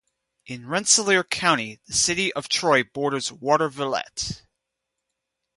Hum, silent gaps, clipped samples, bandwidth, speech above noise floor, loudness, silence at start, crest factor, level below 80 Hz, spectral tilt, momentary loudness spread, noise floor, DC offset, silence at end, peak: none; none; under 0.1%; 11.5 kHz; 59 dB; -22 LUFS; 0.5 s; 22 dB; -56 dBFS; -2 dB/octave; 12 LU; -82 dBFS; under 0.1%; 1.2 s; -4 dBFS